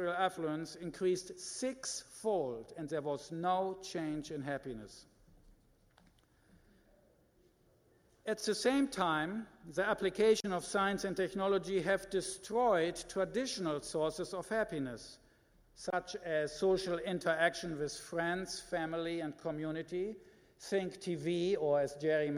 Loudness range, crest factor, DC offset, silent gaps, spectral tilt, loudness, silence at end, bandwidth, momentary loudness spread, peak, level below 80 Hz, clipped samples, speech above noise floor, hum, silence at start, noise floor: 7 LU; 20 dB; under 0.1%; none; -4.5 dB/octave; -36 LUFS; 0 s; 15.5 kHz; 9 LU; -18 dBFS; -66 dBFS; under 0.1%; 34 dB; none; 0 s; -69 dBFS